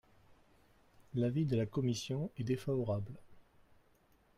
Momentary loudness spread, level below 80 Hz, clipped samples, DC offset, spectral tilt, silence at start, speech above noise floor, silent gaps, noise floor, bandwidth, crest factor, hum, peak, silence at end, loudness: 8 LU; -66 dBFS; under 0.1%; under 0.1%; -7 dB/octave; 1 s; 34 dB; none; -70 dBFS; 15 kHz; 16 dB; none; -24 dBFS; 0.95 s; -37 LUFS